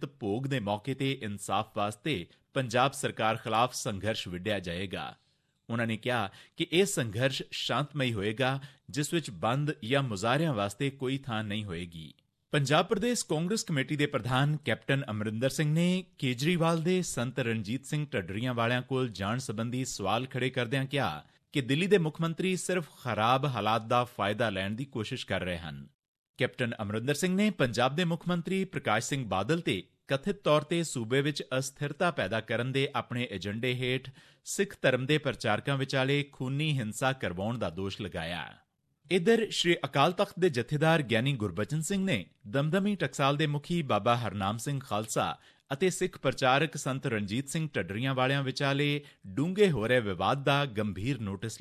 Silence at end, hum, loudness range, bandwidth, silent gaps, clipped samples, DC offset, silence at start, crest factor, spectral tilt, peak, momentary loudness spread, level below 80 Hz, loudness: 0 s; none; 3 LU; 14.5 kHz; 25.94-26.34 s; under 0.1%; under 0.1%; 0 s; 20 dB; -5 dB/octave; -12 dBFS; 8 LU; -60 dBFS; -30 LUFS